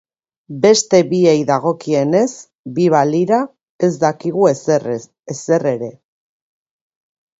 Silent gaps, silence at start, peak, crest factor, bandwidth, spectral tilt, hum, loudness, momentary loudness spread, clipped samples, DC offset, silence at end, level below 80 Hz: 2.55-2.64 s, 3.69-3.79 s; 0.5 s; 0 dBFS; 16 dB; 8 kHz; -5.5 dB/octave; none; -15 LUFS; 14 LU; under 0.1%; under 0.1%; 1.5 s; -62 dBFS